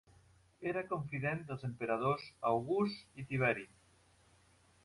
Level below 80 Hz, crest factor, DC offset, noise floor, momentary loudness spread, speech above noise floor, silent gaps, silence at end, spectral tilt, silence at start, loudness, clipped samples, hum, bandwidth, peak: -70 dBFS; 20 dB; under 0.1%; -68 dBFS; 9 LU; 31 dB; none; 1.2 s; -7.5 dB/octave; 0.6 s; -37 LUFS; under 0.1%; none; 11.5 kHz; -18 dBFS